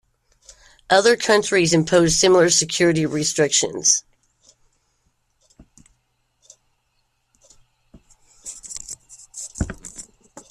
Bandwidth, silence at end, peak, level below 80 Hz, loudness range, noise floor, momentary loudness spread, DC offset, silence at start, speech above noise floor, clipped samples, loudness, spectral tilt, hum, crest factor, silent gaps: 14 kHz; 0.1 s; -2 dBFS; -48 dBFS; 22 LU; -69 dBFS; 22 LU; under 0.1%; 0.9 s; 52 dB; under 0.1%; -17 LUFS; -3 dB/octave; none; 20 dB; none